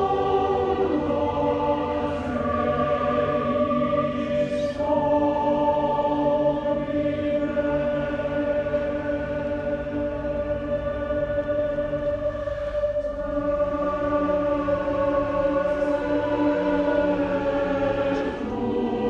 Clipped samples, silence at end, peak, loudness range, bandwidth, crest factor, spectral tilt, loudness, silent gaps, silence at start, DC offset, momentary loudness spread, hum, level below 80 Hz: under 0.1%; 0 s; -10 dBFS; 4 LU; 7.2 kHz; 14 dB; -8 dB/octave; -24 LUFS; none; 0 s; under 0.1%; 5 LU; none; -42 dBFS